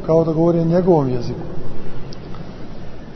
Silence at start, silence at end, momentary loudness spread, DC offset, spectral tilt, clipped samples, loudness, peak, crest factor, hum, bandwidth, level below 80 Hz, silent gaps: 0 s; 0 s; 20 LU; under 0.1%; -9.5 dB/octave; under 0.1%; -17 LUFS; -2 dBFS; 16 dB; none; 6.2 kHz; -36 dBFS; none